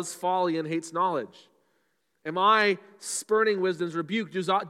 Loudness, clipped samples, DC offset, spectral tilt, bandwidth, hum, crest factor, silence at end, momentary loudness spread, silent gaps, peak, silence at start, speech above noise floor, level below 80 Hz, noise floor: -26 LUFS; under 0.1%; under 0.1%; -4 dB/octave; 15.5 kHz; none; 18 dB; 0 s; 11 LU; none; -8 dBFS; 0 s; 47 dB; -88 dBFS; -74 dBFS